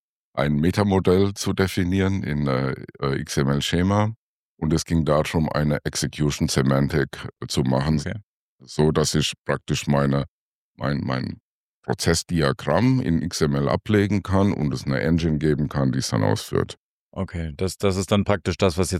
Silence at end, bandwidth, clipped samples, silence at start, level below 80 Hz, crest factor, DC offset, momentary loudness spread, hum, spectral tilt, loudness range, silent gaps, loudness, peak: 0 s; 15 kHz; under 0.1%; 0.35 s; -42 dBFS; 18 dB; under 0.1%; 9 LU; none; -5.5 dB/octave; 2 LU; 4.16-4.57 s, 8.24-8.59 s, 9.38-9.45 s, 10.28-10.75 s, 11.40-11.83 s, 16.77-17.12 s; -23 LUFS; -4 dBFS